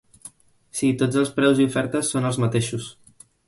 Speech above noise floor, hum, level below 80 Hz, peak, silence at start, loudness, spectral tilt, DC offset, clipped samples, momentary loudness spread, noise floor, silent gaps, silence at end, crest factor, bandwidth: 26 dB; none; -58 dBFS; -6 dBFS; 0.25 s; -22 LUFS; -5.5 dB/octave; under 0.1%; under 0.1%; 12 LU; -47 dBFS; none; 0.55 s; 18 dB; 11.5 kHz